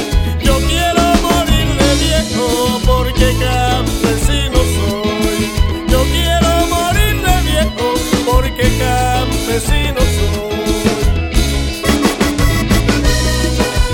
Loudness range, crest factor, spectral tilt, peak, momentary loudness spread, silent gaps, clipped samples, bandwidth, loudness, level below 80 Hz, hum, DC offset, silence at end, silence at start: 2 LU; 12 dB; -4.5 dB/octave; 0 dBFS; 4 LU; none; under 0.1%; 17.5 kHz; -14 LUFS; -18 dBFS; none; under 0.1%; 0 s; 0 s